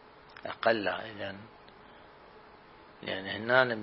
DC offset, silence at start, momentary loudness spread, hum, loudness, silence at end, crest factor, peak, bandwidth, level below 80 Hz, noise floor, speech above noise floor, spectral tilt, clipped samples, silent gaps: under 0.1%; 0.05 s; 27 LU; none; -31 LUFS; 0 s; 26 dB; -8 dBFS; 5.8 kHz; -70 dBFS; -54 dBFS; 24 dB; -8 dB/octave; under 0.1%; none